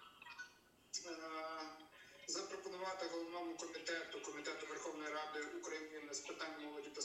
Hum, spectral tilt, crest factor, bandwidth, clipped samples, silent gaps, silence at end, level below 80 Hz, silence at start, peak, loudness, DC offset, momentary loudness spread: none; -1 dB/octave; 18 dB; 16 kHz; under 0.1%; none; 0 s; -86 dBFS; 0 s; -30 dBFS; -47 LUFS; under 0.1%; 9 LU